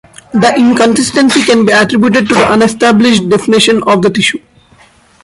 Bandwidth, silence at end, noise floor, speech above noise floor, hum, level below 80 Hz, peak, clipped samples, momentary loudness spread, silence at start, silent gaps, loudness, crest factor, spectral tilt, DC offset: 11.5 kHz; 0.85 s; -43 dBFS; 35 dB; none; -44 dBFS; 0 dBFS; under 0.1%; 3 LU; 0.35 s; none; -8 LUFS; 8 dB; -4 dB/octave; under 0.1%